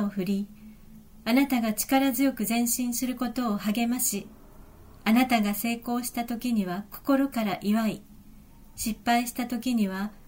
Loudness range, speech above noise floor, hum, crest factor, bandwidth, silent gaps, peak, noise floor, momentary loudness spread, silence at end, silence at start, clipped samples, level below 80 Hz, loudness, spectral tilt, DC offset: 3 LU; 23 dB; none; 16 dB; 16.5 kHz; none; -10 dBFS; -50 dBFS; 9 LU; 0.1 s; 0 s; under 0.1%; -54 dBFS; -27 LUFS; -4 dB/octave; under 0.1%